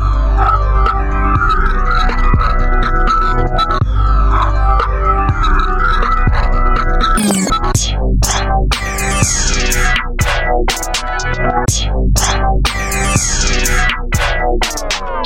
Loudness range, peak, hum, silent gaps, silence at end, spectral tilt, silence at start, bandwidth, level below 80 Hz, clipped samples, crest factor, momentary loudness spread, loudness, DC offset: 1 LU; 0 dBFS; none; none; 0 s; -3.5 dB/octave; 0 s; 17 kHz; -14 dBFS; under 0.1%; 12 dB; 3 LU; -14 LUFS; under 0.1%